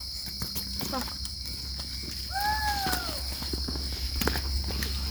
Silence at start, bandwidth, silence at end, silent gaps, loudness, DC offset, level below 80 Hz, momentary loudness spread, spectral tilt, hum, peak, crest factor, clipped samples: 0 s; over 20 kHz; 0 s; none; -31 LUFS; under 0.1%; -36 dBFS; 6 LU; -3 dB/octave; none; -8 dBFS; 22 dB; under 0.1%